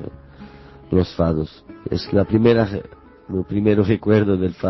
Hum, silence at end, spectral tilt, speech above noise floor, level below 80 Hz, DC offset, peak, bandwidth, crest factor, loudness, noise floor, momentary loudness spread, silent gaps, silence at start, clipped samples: none; 0 s; -9 dB/octave; 23 dB; -38 dBFS; under 0.1%; -2 dBFS; 6 kHz; 16 dB; -19 LUFS; -41 dBFS; 14 LU; none; 0 s; under 0.1%